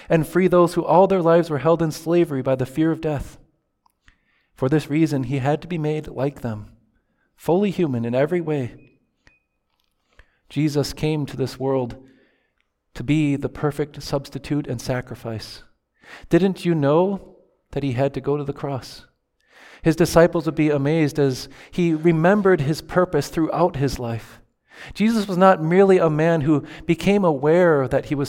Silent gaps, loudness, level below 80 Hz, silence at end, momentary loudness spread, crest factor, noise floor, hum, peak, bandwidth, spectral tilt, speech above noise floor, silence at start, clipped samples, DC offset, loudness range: none; -20 LUFS; -46 dBFS; 0 s; 14 LU; 20 dB; -70 dBFS; none; -2 dBFS; 17 kHz; -7 dB/octave; 51 dB; 0.1 s; under 0.1%; under 0.1%; 7 LU